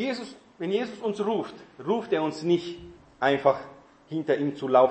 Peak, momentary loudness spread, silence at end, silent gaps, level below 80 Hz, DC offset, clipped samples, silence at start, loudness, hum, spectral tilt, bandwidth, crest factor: -6 dBFS; 16 LU; 0 s; none; -66 dBFS; under 0.1%; under 0.1%; 0 s; -27 LUFS; none; -6.5 dB/octave; 8.6 kHz; 20 dB